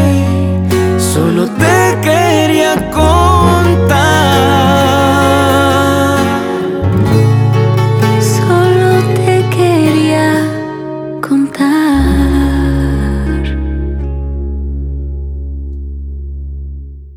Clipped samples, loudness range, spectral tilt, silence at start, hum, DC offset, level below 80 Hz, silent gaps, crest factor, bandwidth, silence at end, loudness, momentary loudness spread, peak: under 0.1%; 9 LU; -6 dB/octave; 0 s; none; under 0.1%; -22 dBFS; none; 10 dB; 18 kHz; 0 s; -11 LUFS; 13 LU; 0 dBFS